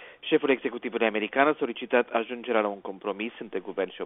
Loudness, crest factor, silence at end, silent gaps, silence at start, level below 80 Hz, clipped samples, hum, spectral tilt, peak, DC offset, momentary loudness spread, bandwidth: -27 LUFS; 22 dB; 0 s; none; 0 s; -74 dBFS; under 0.1%; none; -2 dB/octave; -6 dBFS; under 0.1%; 10 LU; 4 kHz